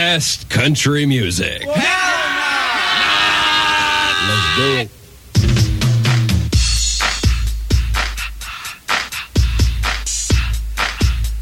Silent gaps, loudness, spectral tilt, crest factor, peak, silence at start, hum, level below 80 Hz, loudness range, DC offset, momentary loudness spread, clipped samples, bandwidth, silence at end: none; -16 LUFS; -3.5 dB/octave; 16 dB; 0 dBFS; 0 s; none; -22 dBFS; 5 LU; under 0.1%; 7 LU; under 0.1%; 16.5 kHz; 0 s